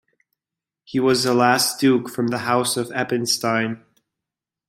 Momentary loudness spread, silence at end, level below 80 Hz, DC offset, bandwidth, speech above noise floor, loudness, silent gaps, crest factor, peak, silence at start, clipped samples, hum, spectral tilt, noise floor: 7 LU; 0.9 s; -64 dBFS; under 0.1%; 16.5 kHz; 68 dB; -20 LUFS; none; 20 dB; -2 dBFS; 0.9 s; under 0.1%; none; -3.5 dB/octave; -88 dBFS